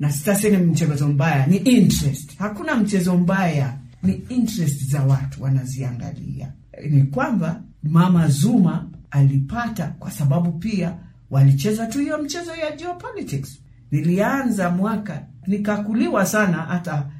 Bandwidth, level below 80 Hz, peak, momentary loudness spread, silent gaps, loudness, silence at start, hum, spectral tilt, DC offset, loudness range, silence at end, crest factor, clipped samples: 16 kHz; -46 dBFS; -4 dBFS; 12 LU; none; -20 LUFS; 0 s; none; -6.5 dB/octave; under 0.1%; 5 LU; 0 s; 16 dB; under 0.1%